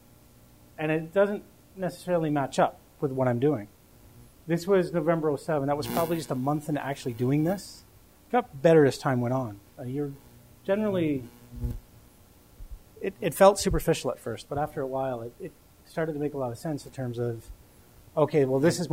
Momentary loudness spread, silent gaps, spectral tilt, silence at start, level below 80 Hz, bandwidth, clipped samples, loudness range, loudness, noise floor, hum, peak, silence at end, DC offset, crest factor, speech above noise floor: 15 LU; none; -6 dB/octave; 0.8 s; -48 dBFS; 16 kHz; under 0.1%; 7 LU; -28 LUFS; -56 dBFS; none; -4 dBFS; 0 s; under 0.1%; 24 dB; 29 dB